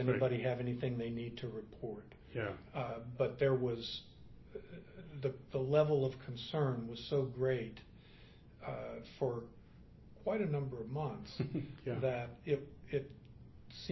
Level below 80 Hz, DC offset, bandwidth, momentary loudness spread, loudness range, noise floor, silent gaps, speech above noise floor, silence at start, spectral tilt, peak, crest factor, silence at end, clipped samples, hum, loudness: -62 dBFS; under 0.1%; 6 kHz; 19 LU; 5 LU; -59 dBFS; none; 21 dB; 0 s; -6 dB/octave; -18 dBFS; 20 dB; 0 s; under 0.1%; none; -39 LUFS